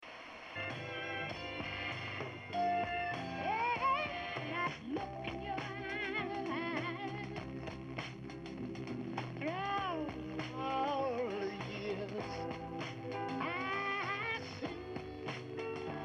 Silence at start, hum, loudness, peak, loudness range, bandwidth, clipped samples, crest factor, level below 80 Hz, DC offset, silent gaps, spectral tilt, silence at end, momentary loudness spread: 0 s; none; -39 LUFS; -24 dBFS; 4 LU; 11.5 kHz; under 0.1%; 16 dB; -62 dBFS; under 0.1%; none; -6 dB/octave; 0 s; 8 LU